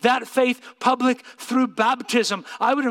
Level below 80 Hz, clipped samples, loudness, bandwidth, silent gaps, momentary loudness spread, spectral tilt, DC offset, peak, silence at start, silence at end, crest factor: -80 dBFS; under 0.1%; -22 LUFS; 16 kHz; none; 4 LU; -3.5 dB/octave; under 0.1%; -4 dBFS; 0.05 s; 0 s; 18 dB